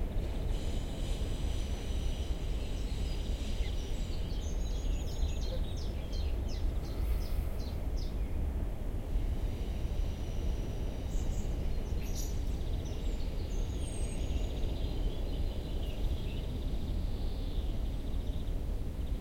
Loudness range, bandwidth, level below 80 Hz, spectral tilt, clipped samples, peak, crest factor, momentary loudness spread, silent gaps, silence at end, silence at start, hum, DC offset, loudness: 1 LU; 16.5 kHz; -34 dBFS; -6 dB/octave; under 0.1%; -20 dBFS; 12 dB; 2 LU; none; 0 s; 0 s; none; under 0.1%; -38 LUFS